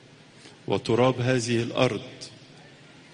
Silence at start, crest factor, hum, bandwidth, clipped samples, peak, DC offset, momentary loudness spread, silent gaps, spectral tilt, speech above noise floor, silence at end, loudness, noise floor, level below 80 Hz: 0.45 s; 20 dB; none; 10 kHz; under 0.1%; -8 dBFS; under 0.1%; 20 LU; none; -5.5 dB/octave; 26 dB; 0.5 s; -25 LUFS; -50 dBFS; -62 dBFS